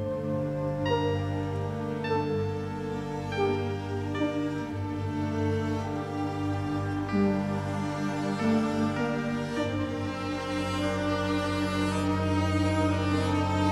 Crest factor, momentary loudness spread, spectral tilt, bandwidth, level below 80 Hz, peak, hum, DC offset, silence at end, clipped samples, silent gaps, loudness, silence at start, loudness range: 14 dB; 6 LU; -7 dB/octave; 12.5 kHz; -52 dBFS; -14 dBFS; none; under 0.1%; 0 s; under 0.1%; none; -29 LUFS; 0 s; 3 LU